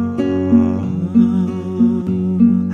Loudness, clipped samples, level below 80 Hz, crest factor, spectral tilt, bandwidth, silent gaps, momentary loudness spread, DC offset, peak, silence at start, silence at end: -16 LUFS; under 0.1%; -50 dBFS; 14 dB; -10 dB/octave; 5.8 kHz; none; 5 LU; under 0.1%; -2 dBFS; 0 s; 0 s